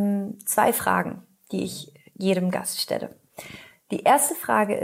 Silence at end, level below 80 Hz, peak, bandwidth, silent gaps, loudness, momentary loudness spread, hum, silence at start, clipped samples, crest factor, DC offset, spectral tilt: 0 s; -68 dBFS; -6 dBFS; 16 kHz; none; -24 LUFS; 21 LU; none; 0 s; under 0.1%; 20 dB; under 0.1%; -4 dB/octave